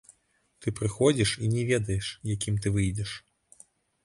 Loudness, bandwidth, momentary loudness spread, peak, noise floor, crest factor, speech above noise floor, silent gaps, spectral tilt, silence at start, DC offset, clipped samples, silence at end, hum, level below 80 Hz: -28 LUFS; 11.5 kHz; 11 LU; -10 dBFS; -70 dBFS; 20 dB; 43 dB; none; -5 dB/octave; 0.6 s; under 0.1%; under 0.1%; 0.85 s; none; -48 dBFS